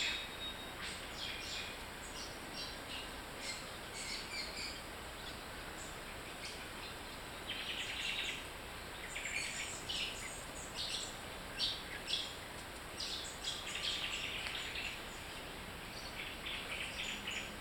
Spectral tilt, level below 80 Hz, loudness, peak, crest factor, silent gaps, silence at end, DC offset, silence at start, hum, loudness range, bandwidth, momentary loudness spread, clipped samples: -1.5 dB/octave; -58 dBFS; -42 LUFS; -22 dBFS; 22 dB; none; 0 s; under 0.1%; 0 s; none; 4 LU; 19 kHz; 8 LU; under 0.1%